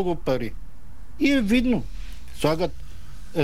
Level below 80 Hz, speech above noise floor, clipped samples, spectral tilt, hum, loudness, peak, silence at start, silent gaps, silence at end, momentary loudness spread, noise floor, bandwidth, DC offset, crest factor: -38 dBFS; 20 dB; under 0.1%; -6 dB/octave; none; -24 LUFS; -8 dBFS; 0 s; none; 0 s; 22 LU; -43 dBFS; 16 kHz; 3%; 18 dB